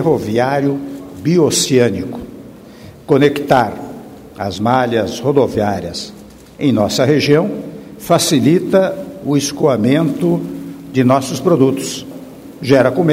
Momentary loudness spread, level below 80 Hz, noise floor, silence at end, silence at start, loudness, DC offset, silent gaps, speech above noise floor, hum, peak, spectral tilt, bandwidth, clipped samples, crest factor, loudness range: 17 LU; -48 dBFS; -37 dBFS; 0 s; 0 s; -15 LUFS; under 0.1%; none; 23 dB; none; 0 dBFS; -5.5 dB/octave; 16.5 kHz; under 0.1%; 14 dB; 3 LU